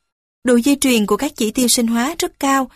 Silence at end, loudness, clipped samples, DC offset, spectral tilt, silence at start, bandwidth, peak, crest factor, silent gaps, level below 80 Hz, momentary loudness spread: 0.1 s; -16 LUFS; under 0.1%; under 0.1%; -3 dB/octave; 0.45 s; 15.5 kHz; -2 dBFS; 16 dB; none; -48 dBFS; 6 LU